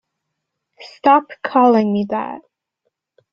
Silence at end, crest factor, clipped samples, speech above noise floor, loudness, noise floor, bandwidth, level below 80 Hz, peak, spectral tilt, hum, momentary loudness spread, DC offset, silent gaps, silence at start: 0.95 s; 16 dB; under 0.1%; 62 dB; -16 LUFS; -77 dBFS; 7 kHz; -66 dBFS; -2 dBFS; -8 dB/octave; none; 13 LU; under 0.1%; none; 0.8 s